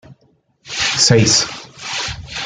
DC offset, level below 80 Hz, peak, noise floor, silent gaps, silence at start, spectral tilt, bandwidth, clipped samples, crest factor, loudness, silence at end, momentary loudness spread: under 0.1%; -44 dBFS; 0 dBFS; -58 dBFS; none; 0.1 s; -3 dB/octave; 11 kHz; under 0.1%; 18 dB; -15 LUFS; 0 s; 15 LU